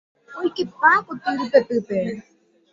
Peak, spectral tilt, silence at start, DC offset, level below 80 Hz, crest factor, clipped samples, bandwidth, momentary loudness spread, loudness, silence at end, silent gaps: -2 dBFS; -6 dB/octave; 0.3 s; under 0.1%; -66 dBFS; 20 dB; under 0.1%; 7.6 kHz; 13 LU; -21 LUFS; 0.5 s; none